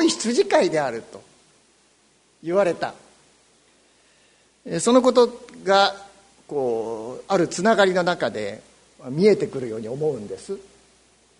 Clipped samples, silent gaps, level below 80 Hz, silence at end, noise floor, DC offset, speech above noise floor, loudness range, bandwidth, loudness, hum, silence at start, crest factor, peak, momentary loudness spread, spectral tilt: under 0.1%; none; -64 dBFS; 0.8 s; -60 dBFS; under 0.1%; 39 dB; 8 LU; 11 kHz; -22 LUFS; none; 0 s; 20 dB; -2 dBFS; 16 LU; -4.5 dB/octave